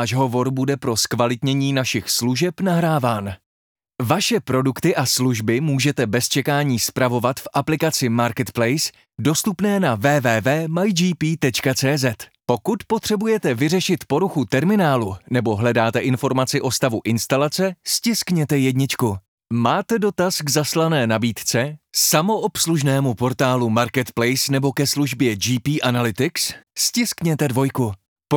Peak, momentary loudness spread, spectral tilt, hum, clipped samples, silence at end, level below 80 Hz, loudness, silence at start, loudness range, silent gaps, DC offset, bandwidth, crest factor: -2 dBFS; 4 LU; -4.5 dB/octave; none; under 0.1%; 0 s; -58 dBFS; -20 LUFS; 0 s; 1 LU; 3.46-3.75 s, 19.28-19.38 s, 28.08-28.16 s; under 0.1%; over 20 kHz; 18 dB